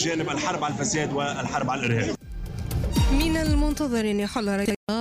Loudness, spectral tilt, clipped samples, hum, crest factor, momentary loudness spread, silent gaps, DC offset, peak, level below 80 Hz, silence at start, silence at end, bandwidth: -25 LUFS; -5 dB/octave; under 0.1%; none; 12 dB; 7 LU; 4.76-4.87 s; under 0.1%; -12 dBFS; -32 dBFS; 0 s; 0 s; 15.5 kHz